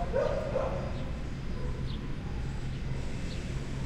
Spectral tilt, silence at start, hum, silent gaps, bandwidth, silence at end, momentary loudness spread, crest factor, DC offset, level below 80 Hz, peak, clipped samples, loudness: -7 dB/octave; 0 s; none; none; 10 kHz; 0 s; 7 LU; 16 dB; under 0.1%; -38 dBFS; -16 dBFS; under 0.1%; -36 LUFS